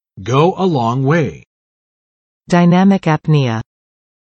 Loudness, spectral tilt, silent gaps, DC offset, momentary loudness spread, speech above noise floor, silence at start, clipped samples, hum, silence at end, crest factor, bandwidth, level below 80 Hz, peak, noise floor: -14 LUFS; -7.5 dB/octave; 1.46-2.41 s; under 0.1%; 8 LU; over 77 dB; 0.15 s; under 0.1%; none; 0.75 s; 16 dB; 8.4 kHz; -52 dBFS; 0 dBFS; under -90 dBFS